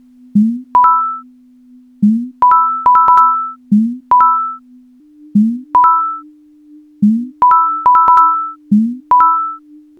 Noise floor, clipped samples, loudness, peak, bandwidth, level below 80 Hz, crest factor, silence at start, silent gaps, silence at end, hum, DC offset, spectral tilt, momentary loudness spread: -43 dBFS; under 0.1%; -11 LUFS; 0 dBFS; 4.5 kHz; -56 dBFS; 12 dB; 0.35 s; none; 0.4 s; none; under 0.1%; -9 dB/octave; 10 LU